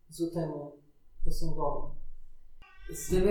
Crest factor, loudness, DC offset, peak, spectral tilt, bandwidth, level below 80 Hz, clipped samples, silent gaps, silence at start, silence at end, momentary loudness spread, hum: 16 dB; -35 LUFS; under 0.1%; -14 dBFS; -6 dB/octave; 16 kHz; -36 dBFS; under 0.1%; none; 0.1 s; 0 s; 19 LU; none